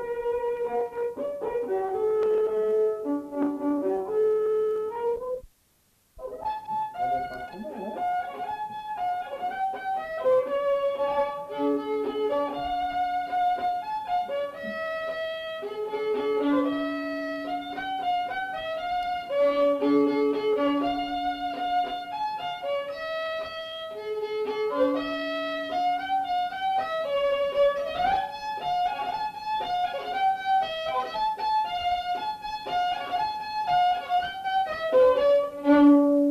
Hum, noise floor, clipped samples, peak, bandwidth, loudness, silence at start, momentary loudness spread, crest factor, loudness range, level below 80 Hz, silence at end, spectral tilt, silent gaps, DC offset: none; -66 dBFS; under 0.1%; -8 dBFS; 14 kHz; -27 LUFS; 0 s; 9 LU; 18 dB; 5 LU; -58 dBFS; 0 s; -5 dB/octave; none; under 0.1%